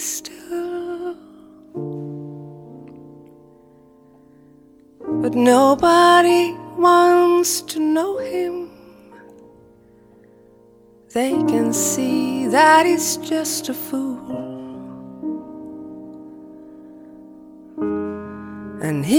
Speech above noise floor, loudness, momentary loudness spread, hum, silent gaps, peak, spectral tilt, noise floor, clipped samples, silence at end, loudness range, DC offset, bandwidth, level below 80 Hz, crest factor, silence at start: 34 dB; -18 LUFS; 24 LU; none; none; 0 dBFS; -3.5 dB/octave; -50 dBFS; under 0.1%; 0 s; 20 LU; under 0.1%; 18 kHz; -58 dBFS; 20 dB; 0 s